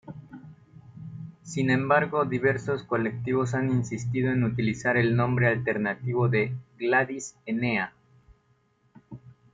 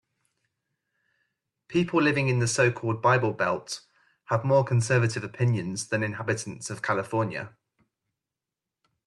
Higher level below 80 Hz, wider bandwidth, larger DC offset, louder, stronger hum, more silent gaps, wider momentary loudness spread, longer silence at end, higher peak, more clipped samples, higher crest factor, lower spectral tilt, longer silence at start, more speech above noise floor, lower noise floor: first, -60 dBFS vs -66 dBFS; second, 9 kHz vs 12 kHz; neither; about the same, -26 LUFS vs -26 LUFS; neither; neither; first, 19 LU vs 9 LU; second, 0.2 s vs 1.6 s; about the same, -8 dBFS vs -10 dBFS; neither; about the same, 20 dB vs 18 dB; first, -7 dB/octave vs -5.5 dB/octave; second, 0.05 s vs 1.7 s; second, 41 dB vs 63 dB; second, -67 dBFS vs -88 dBFS